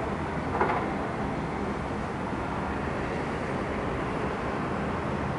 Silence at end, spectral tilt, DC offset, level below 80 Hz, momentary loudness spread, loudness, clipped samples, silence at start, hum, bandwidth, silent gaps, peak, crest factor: 0 s; -7 dB/octave; under 0.1%; -42 dBFS; 4 LU; -31 LUFS; under 0.1%; 0 s; none; 11.5 kHz; none; -12 dBFS; 18 dB